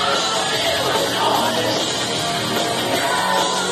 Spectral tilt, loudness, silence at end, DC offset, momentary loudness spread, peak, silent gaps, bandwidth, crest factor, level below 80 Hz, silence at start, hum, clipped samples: -2 dB/octave; -18 LUFS; 0 s; under 0.1%; 2 LU; -4 dBFS; none; 14 kHz; 16 dB; -54 dBFS; 0 s; none; under 0.1%